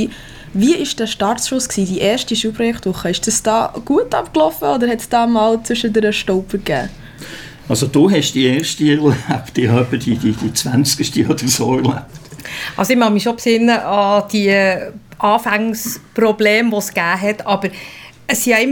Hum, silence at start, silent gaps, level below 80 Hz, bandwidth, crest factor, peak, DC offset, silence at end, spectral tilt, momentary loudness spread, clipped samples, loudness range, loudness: none; 0 s; none; -44 dBFS; 19 kHz; 16 dB; 0 dBFS; under 0.1%; 0 s; -4.5 dB/octave; 11 LU; under 0.1%; 2 LU; -16 LUFS